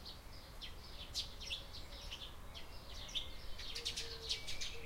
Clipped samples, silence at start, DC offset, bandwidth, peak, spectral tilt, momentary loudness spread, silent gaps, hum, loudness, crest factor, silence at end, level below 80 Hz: under 0.1%; 0 s; under 0.1%; 16 kHz; -22 dBFS; -1.5 dB/octave; 11 LU; none; none; -46 LUFS; 24 dB; 0 s; -54 dBFS